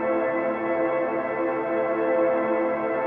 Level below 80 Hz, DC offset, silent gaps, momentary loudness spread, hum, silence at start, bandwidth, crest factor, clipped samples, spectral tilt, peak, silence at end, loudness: -64 dBFS; under 0.1%; none; 4 LU; none; 0 s; 3.8 kHz; 12 dB; under 0.1%; -9 dB/octave; -12 dBFS; 0 s; -24 LUFS